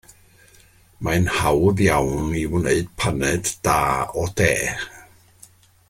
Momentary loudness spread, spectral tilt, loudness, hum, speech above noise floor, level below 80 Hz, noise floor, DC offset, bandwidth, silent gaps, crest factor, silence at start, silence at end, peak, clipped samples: 7 LU; -5 dB/octave; -21 LUFS; none; 32 dB; -40 dBFS; -52 dBFS; under 0.1%; 16.5 kHz; none; 20 dB; 1 s; 0.85 s; -2 dBFS; under 0.1%